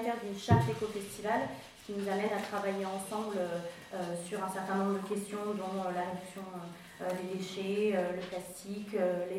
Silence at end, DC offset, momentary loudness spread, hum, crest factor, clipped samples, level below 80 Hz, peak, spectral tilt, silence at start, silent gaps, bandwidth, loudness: 0 s; under 0.1%; 11 LU; none; 22 dB; under 0.1%; -64 dBFS; -12 dBFS; -6 dB/octave; 0 s; none; 16 kHz; -35 LUFS